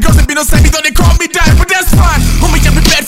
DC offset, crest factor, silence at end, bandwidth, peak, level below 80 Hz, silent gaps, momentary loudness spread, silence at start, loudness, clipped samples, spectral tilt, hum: 4%; 8 dB; 0 s; 16.5 kHz; 0 dBFS; -10 dBFS; none; 2 LU; 0 s; -9 LUFS; 0.6%; -4 dB/octave; none